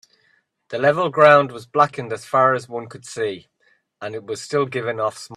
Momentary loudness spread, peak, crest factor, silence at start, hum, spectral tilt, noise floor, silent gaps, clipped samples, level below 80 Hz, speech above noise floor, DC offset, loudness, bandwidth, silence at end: 19 LU; 0 dBFS; 20 dB; 0.7 s; none; -5 dB/octave; -63 dBFS; none; under 0.1%; -66 dBFS; 44 dB; under 0.1%; -19 LUFS; 12 kHz; 0 s